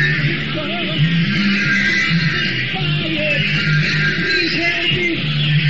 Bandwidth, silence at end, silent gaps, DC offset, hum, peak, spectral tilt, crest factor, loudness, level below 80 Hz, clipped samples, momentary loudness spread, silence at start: 7.6 kHz; 0 s; none; 2%; none; -6 dBFS; -3.5 dB/octave; 12 dB; -16 LUFS; -42 dBFS; under 0.1%; 4 LU; 0 s